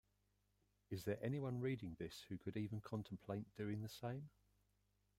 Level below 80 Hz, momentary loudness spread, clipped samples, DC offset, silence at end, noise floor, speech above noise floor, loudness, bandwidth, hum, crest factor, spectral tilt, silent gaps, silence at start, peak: -74 dBFS; 7 LU; under 0.1%; under 0.1%; 0.9 s; -83 dBFS; 36 dB; -48 LUFS; 16 kHz; 50 Hz at -70 dBFS; 18 dB; -7 dB/octave; none; 0.9 s; -30 dBFS